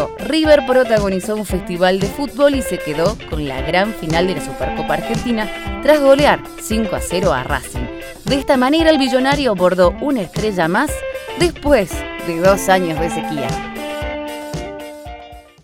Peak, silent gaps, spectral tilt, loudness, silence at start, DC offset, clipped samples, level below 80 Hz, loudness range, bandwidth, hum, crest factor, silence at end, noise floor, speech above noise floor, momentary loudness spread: 0 dBFS; none; -5 dB/octave; -17 LUFS; 0 s; under 0.1%; under 0.1%; -32 dBFS; 3 LU; 17 kHz; none; 16 dB; 0.25 s; -37 dBFS; 21 dB; 13 LU